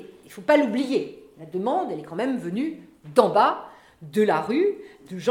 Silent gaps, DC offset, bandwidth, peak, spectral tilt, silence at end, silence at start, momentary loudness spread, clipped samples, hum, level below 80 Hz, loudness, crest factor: none; under 0.1%; 16.5 kHz; -2 dBFS; -6 dB/octave; 0 s; 0 s; 16 LU; under 0.1%; none; -70 dBFS; -24 LUFS; 22 dB